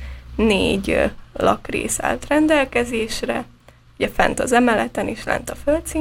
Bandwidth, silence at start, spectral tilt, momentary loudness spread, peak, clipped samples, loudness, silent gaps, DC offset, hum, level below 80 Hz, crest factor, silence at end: 16.5 kHz; 0 s; -4 dB/octave; 9 LU; 0 dBFS; under 0.1%; -20 LUFS; none; under 0.1%; none; -36 dBFS; 20 dB; 0 s